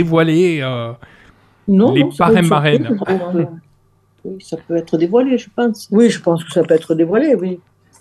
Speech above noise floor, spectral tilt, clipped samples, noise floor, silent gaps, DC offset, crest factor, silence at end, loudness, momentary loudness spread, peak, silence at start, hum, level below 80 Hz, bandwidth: 41 dB; -7 dB/octave; under 0.1%; -55 dBFS; none; under 0.1%; 14 dB; 0.45 s; -15 LUFS; 16 LU; 0 dBFS; 0 s; none; -54 dBFS; 12.5 kHz